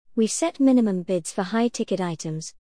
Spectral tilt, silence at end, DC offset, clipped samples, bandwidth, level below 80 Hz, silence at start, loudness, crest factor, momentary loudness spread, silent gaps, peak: -5 dB/octave; 0.1 s; 0.3%; under 0.1%; 10.5 kHz; -66 dBFS; 0.15 s; -23 LUFS; 14 dB; 9 LU; none; -10 dBFS